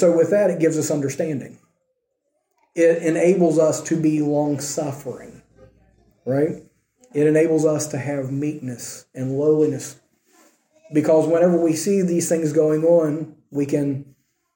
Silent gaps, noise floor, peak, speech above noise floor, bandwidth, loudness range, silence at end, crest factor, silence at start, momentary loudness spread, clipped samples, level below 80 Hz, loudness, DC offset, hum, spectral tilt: none; -73 dBFS; -4 dBFS; 54 dB; 17 kHz; 5 LU; 0.55 s; 16 dB; 0 s; 14 LU; under 0.1%; -66 dBFS; -20 LUFS; under 0.1%; none; -6.5 dB/octave